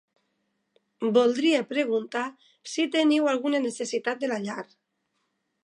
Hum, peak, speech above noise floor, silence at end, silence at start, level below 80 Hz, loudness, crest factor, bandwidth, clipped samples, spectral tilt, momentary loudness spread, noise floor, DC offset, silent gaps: none; -8 dBFS; 51 dB; 1 s; 1 s; -84 dBFS; -26 LUFS; 18 dB; 11 kHz; under 0.1%; -4 dB/octave; 13 LU; -77 dBFS; under 0.1%; none